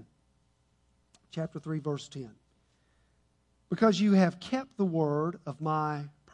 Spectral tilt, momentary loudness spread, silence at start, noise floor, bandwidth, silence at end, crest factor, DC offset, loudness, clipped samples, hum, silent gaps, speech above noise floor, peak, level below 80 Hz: -7 dB/octave; 16 LU; 1.35 s; -70 dBFS; 9.6 kHz; 0.25 s; 20 dB; under 0.1%; -30 LUFS; under 0.1%; none; none; 41 dB; -12 dBFS; -70 dBFS